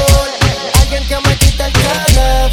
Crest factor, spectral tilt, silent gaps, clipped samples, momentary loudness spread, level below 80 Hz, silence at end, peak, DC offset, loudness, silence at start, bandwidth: 10 dB; -4 dB/octave; none; under 0.1%; 3 LU; -14 dBFS; 0 s; 0 dBFS; under 0.1%; -12 LUFS; 0 s; 18 kHz